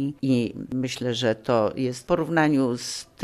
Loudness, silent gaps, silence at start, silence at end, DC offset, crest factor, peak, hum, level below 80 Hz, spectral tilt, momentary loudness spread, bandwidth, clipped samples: -24 LUFS; none; 0 s; 0 s; under 0.1%; 16 dB; -8 dBFS; none; -56 dBFS; -5.5 dB/octave; 8 LU; 13.5 kHz; under 0.1%